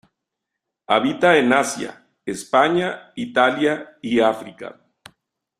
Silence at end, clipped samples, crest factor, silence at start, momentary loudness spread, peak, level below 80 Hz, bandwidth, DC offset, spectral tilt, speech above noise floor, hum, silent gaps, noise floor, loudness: 0.9 s; under 0.1%; 20 dB; 0.9 s; 17 LU; -2 dBFS; -64 dBFS; 13.5 kHz; under 0.1%; -4 dB/octave; 62 dB; none; none; -82 dBFS; -19 LUFS